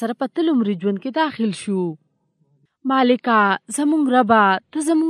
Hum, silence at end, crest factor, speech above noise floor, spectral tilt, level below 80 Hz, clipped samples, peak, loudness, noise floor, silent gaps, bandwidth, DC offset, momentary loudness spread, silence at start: none; 0 s; 18 dB; 47 dB; -5 dB/octave; -72 dBFS; under 0.1%; 0 dBFS; -19 LUFS; -65 dBFS; none; 13 kHz; under 0.1%; 9 LU; 0 s